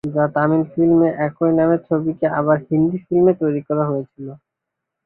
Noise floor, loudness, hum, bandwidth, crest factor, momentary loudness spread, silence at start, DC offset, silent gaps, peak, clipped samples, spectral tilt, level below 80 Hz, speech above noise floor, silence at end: -81 dBFS; -18 LUFS; none; 3.1 kHz; 14 dB; 7 LU; 0.05 s; under 0.1%; none; -4 dBFS; under 0.1%; -12 dB/octave; -56 dBFS; 64 dB; 0.7 s